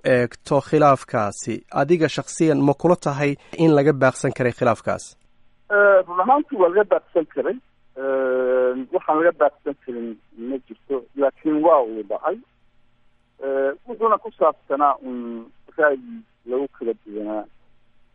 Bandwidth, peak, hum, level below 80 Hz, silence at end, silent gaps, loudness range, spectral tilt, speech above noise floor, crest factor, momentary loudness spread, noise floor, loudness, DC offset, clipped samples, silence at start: 11.5 kHz; -4 dBFS; none; -60 dBFS; 0.7 s; none; 4 LU; -6.5 dB/octave; 38 dB; 18 dB; 15 LU; -58 dBFS; -20 LUFS; under 0.1%; under 0.1%; 0.05 s